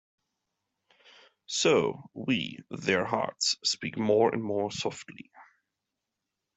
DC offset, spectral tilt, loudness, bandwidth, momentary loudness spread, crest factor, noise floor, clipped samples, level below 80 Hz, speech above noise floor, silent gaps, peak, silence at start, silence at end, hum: under 0.1%; -3.5 dB/octave; -28 LUFS; 8.2 kHz; 13 LU; 20 dB; -86 dBFS; under 0.1%; -72 dBFS; 57 dB; none; -10 dBFS; 1.5 s; 1.15 s; none